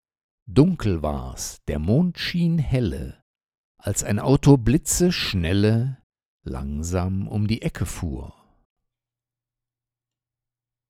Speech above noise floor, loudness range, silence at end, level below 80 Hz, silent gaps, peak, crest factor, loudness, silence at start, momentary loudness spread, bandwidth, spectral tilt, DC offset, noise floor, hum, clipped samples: 68 dB; 9 LU; 2.6 s; -38 dBFS; 3.22-3.34 s, 3.57-3.75 s, 6.03-6.10 s, 6.26-6.39 s; 0 dBFS; 22 dB; -22 LUFS; 0.45 s; 14 LU; 16 kHz; -5.5 dB/octave; under 0.1%; -90 dBFS; none; under 0.1%